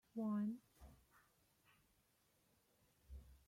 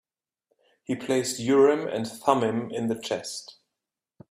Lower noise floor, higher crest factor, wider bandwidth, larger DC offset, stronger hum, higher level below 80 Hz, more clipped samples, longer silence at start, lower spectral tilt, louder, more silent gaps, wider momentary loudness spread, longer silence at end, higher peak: second, -80 dBFS vs -87 dBFS; second, 16 dB vs 22 dB; about the same, 16 kHz vs 15 kHz; neither; neither; about the same, -68 dBFS vs -70 dBFS; neither; second, 0.15 s vs 0.9 s; first, -8.5 dB/octave vs -4.5 dB/octave; second, -45 LUFS vs -26 LUFS; neither; first, 24 LU vs 14 LU; second, 0.1 s vs 0.8 s; second, -36 dBFS vs -6 dBFS